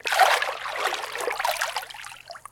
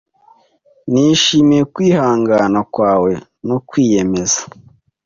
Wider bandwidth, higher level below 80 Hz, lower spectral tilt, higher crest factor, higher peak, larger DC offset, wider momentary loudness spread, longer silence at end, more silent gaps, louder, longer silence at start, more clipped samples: first, 17 kHz vs 7.6 kHz; second, -64 dBFS vs -48 dBFS; second, 1 dB/octave vs -4.5 dB/octave; first, 22 dB vs 14 dB; about the same, -4 dBFS vs -2 dBFS; neither; first, 19 LU vs 11 LU; second, 0.1 s vs 0.6 s; neither; second, -25 LUFS vs -14 LUFS; second, 0.05 s vs 0.85 s; neither